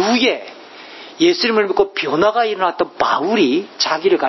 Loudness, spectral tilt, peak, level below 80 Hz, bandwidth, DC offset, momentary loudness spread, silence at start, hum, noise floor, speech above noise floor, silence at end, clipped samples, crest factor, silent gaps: -16 LUFS; -3.5 dB/octave; 0 dBFS; -56 dBFS; 6.2 kHz; under 0.1%; 20 LU; 0 s; none; -37 dBFS; 21 dB; 0 s; under 0.1%; 16 dB; none